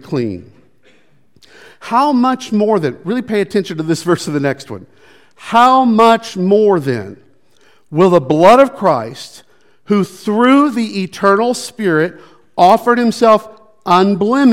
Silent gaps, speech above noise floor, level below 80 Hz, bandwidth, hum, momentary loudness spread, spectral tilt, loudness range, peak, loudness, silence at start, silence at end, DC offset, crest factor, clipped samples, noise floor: none; 41 dB; -56 dBFS; 16 kHz; none; 15 LU; -6 dB/octave; 5 LU; 0 dBFS; -13 LUFS; 0.05 s; 0 s; 0.4%; 14 dB; 0.5%; -53 dBFS